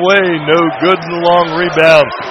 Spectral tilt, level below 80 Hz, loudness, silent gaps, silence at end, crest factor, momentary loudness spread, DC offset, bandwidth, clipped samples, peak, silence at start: -5.5 dB/octave; -50 dBFS; -10 LUFS; none; 0 s; 10 dB; 5 LU; under 0.1%; 11.5 kHz; 0.6%; 0 dBFS; 0 s